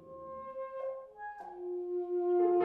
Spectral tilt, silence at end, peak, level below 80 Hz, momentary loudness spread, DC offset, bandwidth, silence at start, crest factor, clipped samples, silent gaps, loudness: -9 dB/octave; 0 s; -20 dBFS; -76 dBFS; 16 LU; under 0.1%; 2.8 kHz; 0 s; 16 dB; under 0.1%; none; -37 LUFS